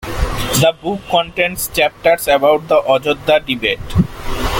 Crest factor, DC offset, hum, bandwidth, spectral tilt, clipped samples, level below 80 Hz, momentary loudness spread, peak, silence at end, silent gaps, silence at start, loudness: 14 dB; under 0.1%; none; 17 kHz; -4 dB/octave; under 0.1%; -28 dBFS; 8 LU; 0 dBFS; 0 s; none; 0 s; -15 LUFS